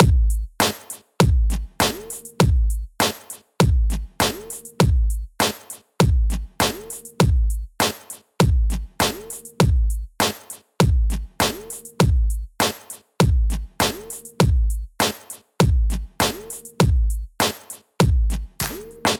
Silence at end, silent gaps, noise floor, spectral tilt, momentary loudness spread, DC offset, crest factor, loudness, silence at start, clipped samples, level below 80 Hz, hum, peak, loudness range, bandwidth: 0 s; none; -38 dBFS; -4.5 dB/octave; 16 LU; under 0.1%; 18 dB; -21 LUFS; 0 s; under 0.1%; -24 dBFS; none; -2 dBFS; 1 LU; over 20 kHz